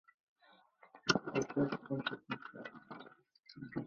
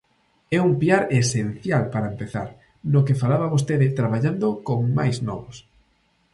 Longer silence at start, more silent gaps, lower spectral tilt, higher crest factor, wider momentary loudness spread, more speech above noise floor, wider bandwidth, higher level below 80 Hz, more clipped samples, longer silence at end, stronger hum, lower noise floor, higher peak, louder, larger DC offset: first, 0.85 s vs 0.5 s; neither; second, -3.5 dB/octave vs -6.5 dB/octave; first, 28 dB vs 18 dB; first, 19 LU vs 12 LU; second, 25 dB vs 43 dB; second, 6.8 kHz vs 11.5 kHz; second, -74 dBFS vs -54 dBFS; neither; second, 0 s vs 0.75 s; neither; about the same, -66 dBFS vs -64 dBFS; second, -14 dBFS vs -4 dBFS; second, -38 LUFS vs -22 LUFS; neither